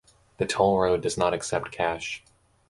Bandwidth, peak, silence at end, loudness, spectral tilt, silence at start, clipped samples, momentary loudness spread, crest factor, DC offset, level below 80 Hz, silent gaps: 11.5 kHz; -6 dBFS; 0.5 s; -26 LUFS; -4 dB/octave; 0.4 s; under 0.1%; 11 LU; 20 dB; under 0.1%; -52 dBFS; none